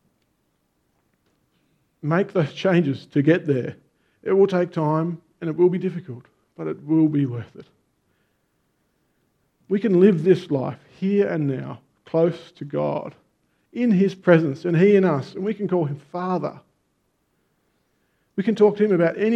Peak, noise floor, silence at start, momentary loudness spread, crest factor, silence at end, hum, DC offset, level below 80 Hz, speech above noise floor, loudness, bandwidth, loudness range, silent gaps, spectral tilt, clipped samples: -2 dBFS; -70 dBFS; 2.05 s; 16 LU; 20 dB; 0 s; none; under 0.1%; -70 dBFS; 49 dB; -21 LUFS; 8 kHz; 6 LU; none; -9 dB/octave; under 0.1%